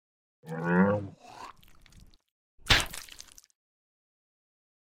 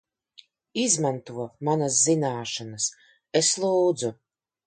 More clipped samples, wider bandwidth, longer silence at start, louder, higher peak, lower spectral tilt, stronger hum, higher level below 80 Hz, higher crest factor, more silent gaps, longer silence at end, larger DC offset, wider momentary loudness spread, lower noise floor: neither; first, 16 kHz vs 9.6 kHz; second, 0.45 s vs 0.75 s; second, -27 LUFS vs -24 LUFS; about the same, -6 dBFS vs -8 dBFS; about the same, -4 dB/octave vs -3.5 dB/octave; neither; first, -48 dBFS vs -72 dBFS; first, 26 dB vs 18 dB; first, 2.31-2.58 s vs none; first, 1.95 s vs 0.55 s; neither; first, 24 LU vs 12 LU; about the same, -56 dBFS vs -56 dBFS